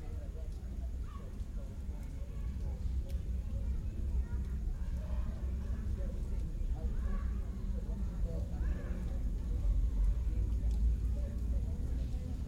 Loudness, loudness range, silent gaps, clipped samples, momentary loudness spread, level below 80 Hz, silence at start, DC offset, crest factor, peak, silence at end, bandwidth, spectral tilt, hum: -39 LUFS; 5 LU; none; under 0.1%; 9 LU; -36 dBFS; 0 s; under 0.1%; 12 dB; -24 dBFS; 0 s; 7.8 kHz; -8 dB/octave; none